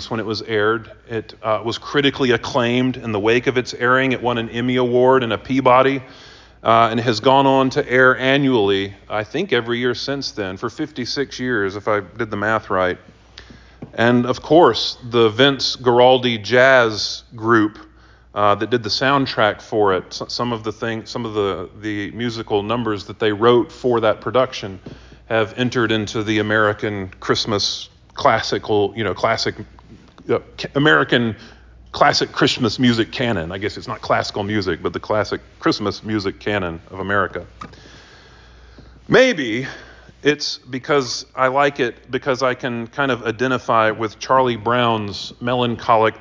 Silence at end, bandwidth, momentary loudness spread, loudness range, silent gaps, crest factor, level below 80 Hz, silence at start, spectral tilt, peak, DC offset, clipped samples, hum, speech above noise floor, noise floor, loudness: 0 s; 7.6 kHz; 12 LU; 6 LU; none; 18 dB; -48 dBFS; 0 s; -5 dB/octave; -2 dBFS; under 0.1%; under 0.1%; none; 26 dB; -45 dBFS; -18 LUFS